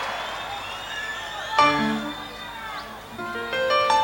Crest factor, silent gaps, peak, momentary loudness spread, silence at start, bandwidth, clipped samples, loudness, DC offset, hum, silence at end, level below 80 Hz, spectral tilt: 22 dB; none; -4 dBFS; 15 LU; 0 s; over 20 kHz; under 0.1%; -25 LUFS; under 0.1%; none; 0 s; -54 dBFS; -3.5 dB/octave